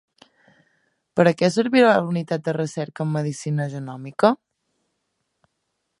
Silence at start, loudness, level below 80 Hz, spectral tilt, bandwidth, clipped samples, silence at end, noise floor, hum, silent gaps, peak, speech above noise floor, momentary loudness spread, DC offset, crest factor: 1.15 s; -21 LUFS; -70 dBFS; -6.5 dB/octave; 11.5 kHz; under 0.1%; 1.65 s; -76 dBFS; none; none; -2 dBFS; 56 dB; 12 LU; under 0.1%; 20 dB